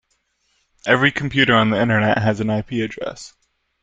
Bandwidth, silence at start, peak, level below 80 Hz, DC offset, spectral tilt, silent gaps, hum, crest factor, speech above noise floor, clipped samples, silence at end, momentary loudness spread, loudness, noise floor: 9 kHz; 0.85 s; 0 dBFS; -50 dBFS; under 0.1%; -6 dB/octave; none; none; 20 dB; 49 dB; under 0.1%; 0.55 s; 15 LU; -18 LUFS; -67 dBFS